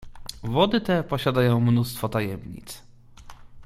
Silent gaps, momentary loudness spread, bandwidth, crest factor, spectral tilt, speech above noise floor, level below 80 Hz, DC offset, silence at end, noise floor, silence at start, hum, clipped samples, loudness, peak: none; 19 LU; 15.5 kHz; 20 dB; -6.5 dB/octave; 22 dB; -48 dBFS; under 0.1%; 0 s; -45 dBFS; 0 s; none; under 0.1%; -23 LUFS; -4 dBFS